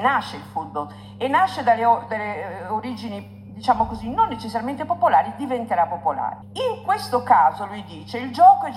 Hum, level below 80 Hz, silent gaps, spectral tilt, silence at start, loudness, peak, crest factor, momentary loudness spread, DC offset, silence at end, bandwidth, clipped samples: none; -52 dBFS; none; -5.5 dB/octave; 0 s; -21 LUFS; -2 dBFS; 18 dB; 15 LU; under 0.1%; 0 s; 15 kHz; under 0.1%